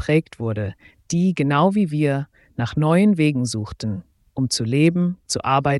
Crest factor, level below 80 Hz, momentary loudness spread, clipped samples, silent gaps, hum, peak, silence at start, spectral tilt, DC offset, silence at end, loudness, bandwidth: 16 dB; -50 dBFS; 12 LU; under 0.1%; none; none; -4 dBFS; 0 s; -6 dB/octave; under 0.1%; 0 s; -20 LUFS; 12 kHz